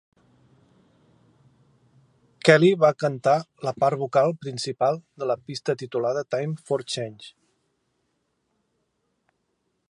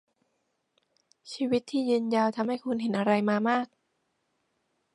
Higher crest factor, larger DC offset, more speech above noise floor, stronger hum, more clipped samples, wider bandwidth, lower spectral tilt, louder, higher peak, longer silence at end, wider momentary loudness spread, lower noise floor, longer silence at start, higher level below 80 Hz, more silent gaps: first, 26 dB vs 20 dB; neither; about the same, 51 dB vs 50 dB; neither; neither; about the same, 11.5 kHz vs 11.5 kHz; about the same, -5.5 dB/octave vs -6 dB/octave; first, -23 LUFS vs -28 LUFS; first, 0 dBFS vs -10 dBFS; first, 2.6 s vs 1.3 s; first, 13 LU vs 7 LU; about the same, -74 dBFS vs -77 dBFS; first, 2.45 s vs 1.25 s; about the same, -72 dBFS vs -76 dBFS; neither